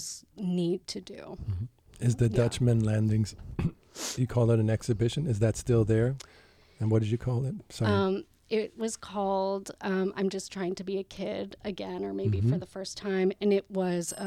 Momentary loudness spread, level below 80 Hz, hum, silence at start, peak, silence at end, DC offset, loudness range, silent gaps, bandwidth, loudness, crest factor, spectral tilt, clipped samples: 11 LU; -52 dBFS; none; 0 s; -14 dBFS; 0 s; under 0.1%; 4 LU; none; 13 kHz; -30 LUFS; 16 dB; -6.5 dB/octave; under 0.1%